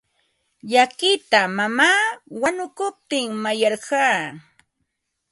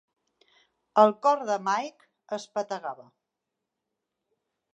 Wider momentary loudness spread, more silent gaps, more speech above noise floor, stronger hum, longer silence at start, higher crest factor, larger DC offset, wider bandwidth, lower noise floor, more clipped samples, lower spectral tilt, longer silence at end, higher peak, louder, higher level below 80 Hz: second, 10 LU vs 18 LU; neither; about the same, 56 dB vs 59 dB; neither; second, 0.65 s vs 0.95 s; about the same, 20 dB vs 24 dB; neither; first, 11.5 kHz vs 8.6 kHz; second, -76 dBFS vs -85 dBFS; neither; second, -2.5 dB/octave vs -4.5 dB/octave; second, 0.9 s vs 1.8 s; first, -2 dBFS vs -6 dBFS; first, -20 LUFS vs -26 LUFS; first, -68 dBFS vs -88 dBFS